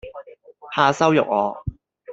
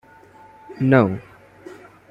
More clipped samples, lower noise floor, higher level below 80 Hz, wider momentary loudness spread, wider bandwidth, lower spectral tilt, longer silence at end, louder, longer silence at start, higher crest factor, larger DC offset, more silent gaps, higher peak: neither; about the same, -44 dBFS vs -47 dBFS; first, -48 dBFS vs -58 dBFS; second, 20 LU vs 26 LU; first, 8 kHz vs 7 kHz; second, -5.5 dB/octave vs -9.5 dB/octave; second, 0 s vs 0.35 s; about the same, -19 LUFS vs -18 LUFS; second, 0.05 s vs 0.7 s; about the same, 20 dB vs 20 dB; neither; neither; about the same, -2 dBFS vs -4 dBFS